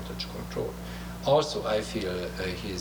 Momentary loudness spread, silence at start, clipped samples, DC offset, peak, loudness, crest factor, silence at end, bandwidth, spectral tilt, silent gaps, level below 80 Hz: 11 LU; 0 s; under 0.1%; under 0.1%; -10 dBFS; -30 LUFS; 20 dB; 0 s; over 20 kHz; -5 dB/octave; none; -44 dBFS